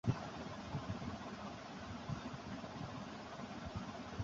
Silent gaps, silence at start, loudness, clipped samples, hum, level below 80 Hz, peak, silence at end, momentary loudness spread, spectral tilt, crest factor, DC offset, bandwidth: none; 0.05 s; -47 LUFS; under 0.1%; none; -60 dBFS; -22 dBFS; 0 s; 4 LU; -5.5 dB/octave; 24 dB; under 0.1%; 7.6 kHz